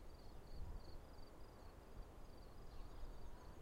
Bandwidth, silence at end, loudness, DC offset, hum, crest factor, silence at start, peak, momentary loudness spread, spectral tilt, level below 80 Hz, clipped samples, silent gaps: 16 kHz; 0 s; -60 LUFS; under 0.1%; none; 14 dB; 0 s; -38 dBFS; 5 LU; -6 dB/octave; -56 dBFS; under 0.1%; none